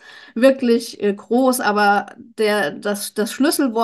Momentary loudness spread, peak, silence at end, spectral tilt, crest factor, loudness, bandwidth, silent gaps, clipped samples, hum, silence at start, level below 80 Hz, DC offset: 8 LU; -2 dBFS; 0 s; -4 dB/octave; 16 dB; -18 LUFS; 13 kHz; none; under 0.1%; none; 0.1 s; -70 dBFS; under 0.1%